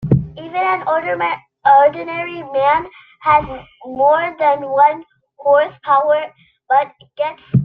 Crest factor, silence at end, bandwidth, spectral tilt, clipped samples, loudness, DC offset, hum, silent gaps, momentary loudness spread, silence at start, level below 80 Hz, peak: 16 dB; 0 s; 4.8 kHz; -9.5 dB/octave; under 0.1%; -16 LUFS; under 0.1%; none; none; 12 LU; 0 s; -46 dBFS; -2 dBFS